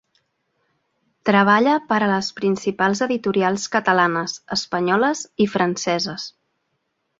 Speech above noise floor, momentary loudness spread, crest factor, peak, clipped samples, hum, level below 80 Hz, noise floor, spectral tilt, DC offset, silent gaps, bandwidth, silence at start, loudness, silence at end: 53 dB; 9 LU; 20 dB; -2 dBFS; under 0.1%; none; -62 dBFS; -73 dBFS; -4.5 dB/octave; under 0.1%; none; 7.8 kHz; 1.25 s; -20 LUFS; 0.9 s